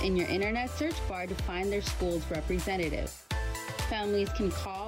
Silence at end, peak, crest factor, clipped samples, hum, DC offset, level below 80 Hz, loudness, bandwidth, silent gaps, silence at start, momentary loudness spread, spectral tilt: 0 s; -18 dBFS; 12 dB; under 0.1%; none; under 0.1%; -40 dBFS; -32 LUFS; 16 kHz; none; 0 s; 5 LU; -5 dB/octave